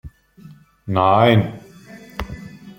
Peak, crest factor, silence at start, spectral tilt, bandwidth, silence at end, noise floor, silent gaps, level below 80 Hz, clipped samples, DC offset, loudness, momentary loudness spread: -2 dBFS; 20 dB; 0.05 s; -7.5 dB/octave; 16.5 kHz; 0.1 s; -45 dBFS; none; -42 dBFS; under 0.1%; under 0.1%; -16 LUFS; 23 LU